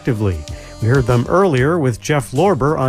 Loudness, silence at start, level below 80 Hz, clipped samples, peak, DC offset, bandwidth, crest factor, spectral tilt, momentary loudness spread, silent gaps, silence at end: -16 LUFS; 0 s; -34 dBFS; under 0.1%; -2 dBFS; under 0.1%; 14.5 kHz; 14 dB; -7 dB/octave; 8 LU; none; 0 s